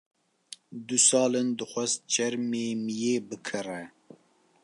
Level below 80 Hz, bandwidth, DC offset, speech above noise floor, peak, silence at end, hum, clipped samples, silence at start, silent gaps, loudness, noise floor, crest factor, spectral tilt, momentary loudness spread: -80 dBFS; 11.5 kHz; under 0.1%; 34 dB; -8 dBFS; 0.75 s; none; under 0.1%; 0.5 s; none; -27 LUFS; -62 dBFS; 20 dB; -2.5 dB/octave; 22 LU